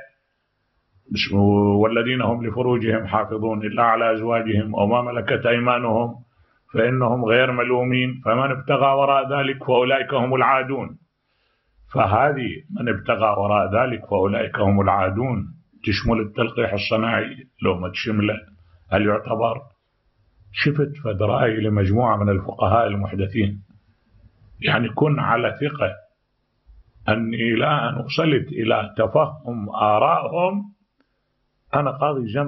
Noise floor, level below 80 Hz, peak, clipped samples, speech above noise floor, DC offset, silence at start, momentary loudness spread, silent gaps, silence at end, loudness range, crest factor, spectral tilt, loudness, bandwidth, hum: -71 dBFS; -50 dBFS; -2 dBFS; under 0.1%; 51 dB; under 0.1%; 0 s; 8 LU; none; 0 s; 4 LU; 18 dB; -8 dB/octave; -21 LUFS; 6 kHz; none